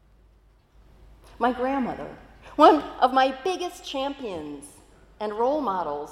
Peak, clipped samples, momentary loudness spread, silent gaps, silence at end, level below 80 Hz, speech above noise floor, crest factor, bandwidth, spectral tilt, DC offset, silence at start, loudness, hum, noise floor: -2 dBFS; under 0.1%; 19 LU; none; 0 s; -54 dBFS; 34 dB; 24 dB; 14.5 kHz; -4.5 dB/octave; under 0.1%; 1.4 s; -24 LUFS; none; -58 dBFS